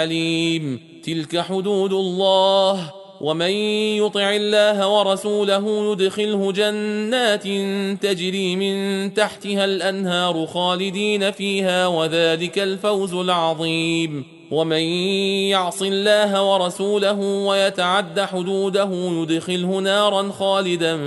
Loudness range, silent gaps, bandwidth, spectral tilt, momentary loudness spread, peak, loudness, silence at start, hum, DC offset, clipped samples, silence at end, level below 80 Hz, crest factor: 2 LU; none; 11.5 kHz; -4.5 dB/octave; 6 LU; -4 dBFS; -20 LUFS; 0 s; none; under 0.1%; under 0.1%; 0 s; -68 dBFS; 16 dB